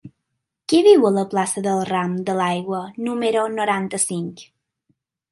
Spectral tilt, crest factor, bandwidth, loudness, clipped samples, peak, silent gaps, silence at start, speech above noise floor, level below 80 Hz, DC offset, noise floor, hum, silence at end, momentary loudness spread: -4.5 dB/octave; 18 dB; 11.5 kHz; -19 LUFS; under 0.1%; -2 dBFS; none; 0.05 s; 59 dB; -68 dBFS; under 0.1%; -78 dBFS; none; 0.9 s; 13 LU